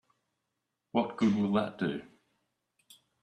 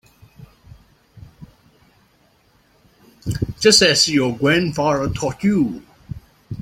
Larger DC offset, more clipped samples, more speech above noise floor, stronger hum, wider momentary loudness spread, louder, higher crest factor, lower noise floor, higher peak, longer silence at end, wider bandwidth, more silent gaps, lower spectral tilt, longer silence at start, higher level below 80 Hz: neither; neither; first, 55 dB vs 41 dB; neither; second, 7 LU vs 25 LU; second, -31 LUFS vs -17 LUFS; about the same, 20 dB vs 20 dB; first, -84 dBFS vs -58 dBFS; second, -14 dBFS vs -2 dBFS; first, 1.2 s vs 0 s; second, 11 kHz vs 16.5 kHz; neither; first, -7 dB/octave vs -3.5 dB/octave; first, 0.95 s vs 0.4 s; second, -70 dBFS vs -46 dBFS